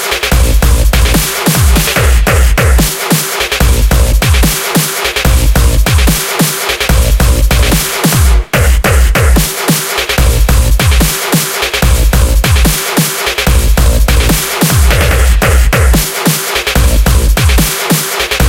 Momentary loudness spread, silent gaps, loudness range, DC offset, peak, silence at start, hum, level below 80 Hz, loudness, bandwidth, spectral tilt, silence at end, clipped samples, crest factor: 2 LU; none; 1 LU; under 0.1%; 0 dBFS; 0 s; none; -10 dBFS; -10 LUFS; 17 kHz; -4 dB/octave; 0 s; under 0.1%; 8 dB